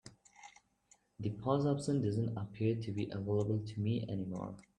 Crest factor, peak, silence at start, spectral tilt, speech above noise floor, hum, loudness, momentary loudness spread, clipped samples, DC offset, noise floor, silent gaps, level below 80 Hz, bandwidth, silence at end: 20 dB; -18 dBFS; 0.05 s; -8 dB/octave; 35 dB; none; -37 LUFS; 13 LU; under 0.1%; under 0.1%; -71 dBFS; none; -68 dBFS; 10 kHz; 0.15 s